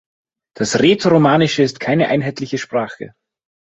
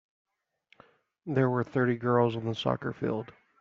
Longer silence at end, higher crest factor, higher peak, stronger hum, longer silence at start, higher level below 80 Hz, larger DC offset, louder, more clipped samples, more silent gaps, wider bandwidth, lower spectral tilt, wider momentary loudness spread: first, 0.55 s vs 0.3 s; about the same, 16 dB vs 20 dB; first, -2 dBFS vs -10 dBFS; neither; second, 0.6 s vs 1.25 s; first, -54 dBFS vs -66 dBFS; neither; first, -16 LUFS vs -29 LUFS; neither; neither; first, 8.2 kHz vs 7.2 kHz; about the same, -5.5 dB/octave vs -6 dB/octave; first, 13 LU vs 10 LU